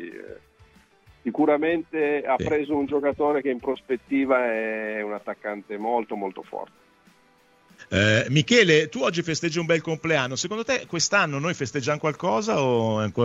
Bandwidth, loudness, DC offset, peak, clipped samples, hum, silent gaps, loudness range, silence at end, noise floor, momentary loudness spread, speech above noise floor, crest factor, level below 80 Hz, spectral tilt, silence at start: 8 kHz; -24 LUFS; under 0.1%; -6 dBFS; under 0.1%; none; none; 6 LU; 0 s; -59 dBFS; 12 LU; 35 dB; 18 dB; -58 dBFS; -4.5 dB/octave; 0 s